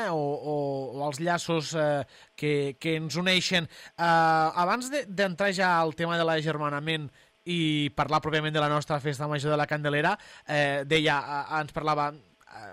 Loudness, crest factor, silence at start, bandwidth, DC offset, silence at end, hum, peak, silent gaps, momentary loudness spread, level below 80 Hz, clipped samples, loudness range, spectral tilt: -27 LUFS; 16 dB; 0 s; 15.5 kHz; under 0.1%; 0 s; none; -10 dBFS; none; 8 LU; -62 dBFS; under 0.1%; 3 LU; -5 dB/octave